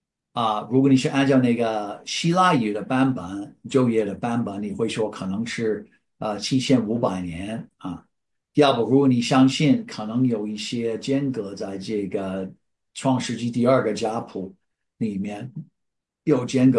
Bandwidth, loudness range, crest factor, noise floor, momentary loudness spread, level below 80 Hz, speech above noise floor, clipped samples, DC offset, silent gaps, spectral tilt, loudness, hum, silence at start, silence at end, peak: 11.5 kHz; 5 LU; 18 dB; -81 dBFS; 15 LU; -64 dBFS; 59 dB; under 0.1%; under 0.1%; none; -6 dB/octave; -23 LUFS; none; 0.35 s; 0 s; -6 dBFS